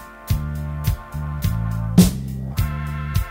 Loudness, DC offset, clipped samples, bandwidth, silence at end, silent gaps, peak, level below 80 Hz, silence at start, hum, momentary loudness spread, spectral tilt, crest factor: -22 LUFS; under 0.1%; under 0.1%; 16.5 kHz; 0 s; none; 0 dBFS; -28 dBFS; 0 s; none; 12 LU; -6 dB/octave; 20 dB